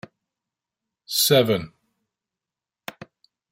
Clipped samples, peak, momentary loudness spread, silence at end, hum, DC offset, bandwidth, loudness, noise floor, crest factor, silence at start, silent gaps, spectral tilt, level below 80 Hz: under 0.1%; -4 dBFS; 23 LU; 1.85 s; none; under 0.1%; 16 kHz; -20 LUFS; -89 dBFS; 24 dB; 1.1 s; none; -3.5 dB/octave; -64 dBFS